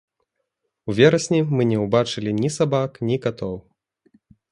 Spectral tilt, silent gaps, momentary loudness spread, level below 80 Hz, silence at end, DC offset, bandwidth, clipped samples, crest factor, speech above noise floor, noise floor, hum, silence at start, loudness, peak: -6 dB/octave; none; 14 LU; -56 dBFS; 0.9 s; under 0.1%; 11.5 kHz; under 0.1%; 22 dB; 57 dB; -77 dBFS; none; 0.85 s; -21 LUFS; 0 dBFS